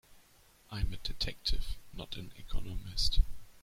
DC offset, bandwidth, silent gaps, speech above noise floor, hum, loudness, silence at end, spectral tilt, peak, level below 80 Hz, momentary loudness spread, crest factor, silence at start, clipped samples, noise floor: under 0.1%; 15 kHz; none; 31 dB; none; -38 LUFS; 0.1 s; -3.5 dB/octave; -14 dBFS; -36 dBFS; 13 LU; 18 dB; 0.1 s; under 0.1%; -63 dBFS